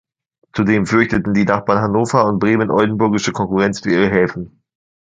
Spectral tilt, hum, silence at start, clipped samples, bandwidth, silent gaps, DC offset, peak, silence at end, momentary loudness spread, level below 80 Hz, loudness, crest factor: -6.5 dB/octave; none; 0.55 s; under 0.1%; 9.2 kHz; none; under 0.1%; 0 dBFS; 0.65 s; 5 LU; -46 dBFS; -16 LUFS; 16 dB